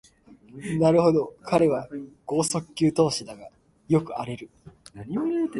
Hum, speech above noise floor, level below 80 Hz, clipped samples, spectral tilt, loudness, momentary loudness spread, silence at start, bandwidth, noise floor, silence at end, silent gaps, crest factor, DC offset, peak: none; 28 dB; -58 dBFS; under 0.1%; -6 dB/octave; -24 LUFS; 18 LU; 0.3 s; 11.5 kHz; -53 dBFS; 0 s; none; 20 dB; under 0.1%; -6 dBFS